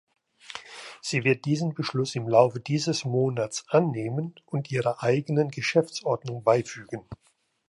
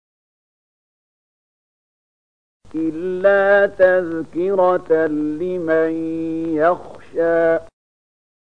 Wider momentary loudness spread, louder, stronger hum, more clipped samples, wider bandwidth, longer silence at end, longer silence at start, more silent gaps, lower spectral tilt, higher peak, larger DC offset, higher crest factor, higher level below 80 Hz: first, 15 LU vs 10 LU; second, -26 LUFS vs -18 LUFS; neither; neither; first, 11.5 kHz vs 6.8 kHz; second, 0.55 s vs 0.75 s; second, 0.5 s vs 2.75 s; neither; second, -5.5 dB/octave vs -7.5 dB/octave; about the same, -4 dBFS vs -2 dBFS; second, under 0.1% vs 0.8%; about the same, 22 dB vs 18 dB; second, -66 dBFS vs -56 dBFS